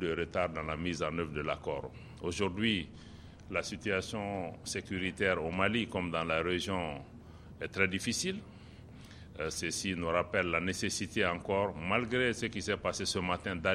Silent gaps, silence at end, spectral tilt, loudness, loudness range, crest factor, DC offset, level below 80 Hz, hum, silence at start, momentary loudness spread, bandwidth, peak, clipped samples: none; 0 s; -4 dB/octave; -34 LUFS; 4 LU; 22 dB; under 0.1%; -56 dBFS; none; 0 s; 16 LU; 14.5 kHz; -12 dBFS; under 0.1%